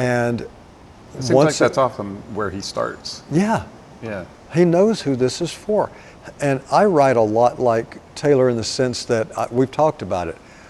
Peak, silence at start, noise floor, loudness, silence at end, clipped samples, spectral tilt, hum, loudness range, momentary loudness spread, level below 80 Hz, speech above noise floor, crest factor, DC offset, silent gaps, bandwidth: -2 dBFS; 0 s; -43 dBFS; -19 LUFS; 0.35 s; under 0.1%; -5.5 dB/octave; none; 3 LU; 15 LU; -50 dBFS; 25 dB; 18 dB; under 0.1%; none; 12.5 kHz